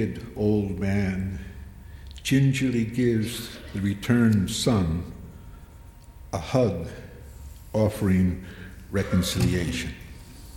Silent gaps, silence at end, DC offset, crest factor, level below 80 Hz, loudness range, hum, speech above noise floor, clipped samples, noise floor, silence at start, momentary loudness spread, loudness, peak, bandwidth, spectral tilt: none; 0 s; under 0.1%; 18 dB; -42 dBFS; 4 LU; none; 22 dB; under 0.1%; -46 dBFS; 0 s; 22 LU; -25 LUFS; -8 dBFS; 17 kHz; -6 dB/octave